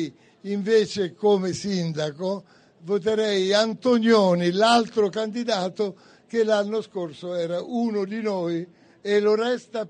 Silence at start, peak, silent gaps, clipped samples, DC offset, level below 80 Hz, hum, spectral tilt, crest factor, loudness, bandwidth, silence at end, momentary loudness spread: 0 s; -6 dBFS; none; under 0.1%; under 0.1%; -68 dBFS; none; -5.5 dB/octave; 16 dB; -23 LUFS; 9.8 kHz; 0 s; 12 LU